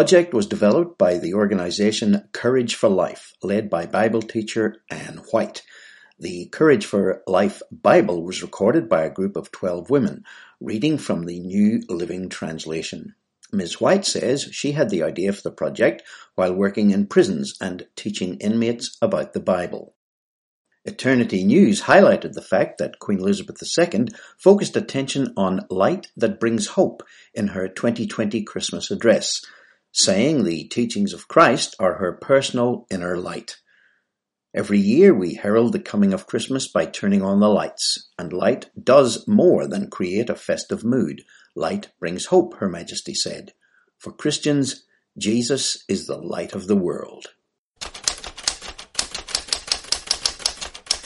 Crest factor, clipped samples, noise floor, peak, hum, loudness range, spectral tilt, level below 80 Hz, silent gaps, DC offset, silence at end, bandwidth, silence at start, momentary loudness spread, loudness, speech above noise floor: 20 dB; under 0.1%; -81 dBFS; 0 dBFS; none; 6 LU; -4.5 dB/octave; -58 dBFS; 19.96-20.65 s, 47.58-47.72 s; under 0.1%; 0.05 s; 11.5 kHz; 0 s; 13 LU; -21 LUFS; 61 dB